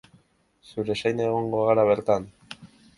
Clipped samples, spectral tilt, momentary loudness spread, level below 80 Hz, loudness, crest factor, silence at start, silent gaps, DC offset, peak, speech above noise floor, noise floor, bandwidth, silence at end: under 0.1%; -6.5 dB/octave; 22 LU; -60 dBFS; -24 LUFS; 20 dB; 0.75 s; none; under 0.1%; -6 dBFS; 39 dB; -62 dBFS; 11.5 kHz; 0.3 s